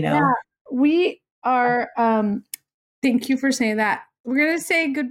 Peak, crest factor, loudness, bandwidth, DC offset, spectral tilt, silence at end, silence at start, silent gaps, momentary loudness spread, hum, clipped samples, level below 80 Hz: -8 dBFS; 14 dB; -21 LUFS; 16.5 kHz; under 0.1%; -5 dB/octave; 0 s; 0 s; 0.61-0.65 s, 1.31-1.42 s, 2.74-3.02 s, 4.20-4.24 s; 9 LU; none; under 0.1%; -64 dBFS